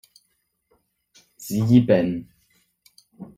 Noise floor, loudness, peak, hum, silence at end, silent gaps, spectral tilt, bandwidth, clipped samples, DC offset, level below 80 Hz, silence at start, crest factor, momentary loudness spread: -71 dBFS; -20 LUFS; -4 dBFS; none; 0.15 s; none; -7.5 dB/octave; 16 kHz; under 0.1%; under 0.1%; -58 dBFS; 1.4 s; 20 dB; 22 LU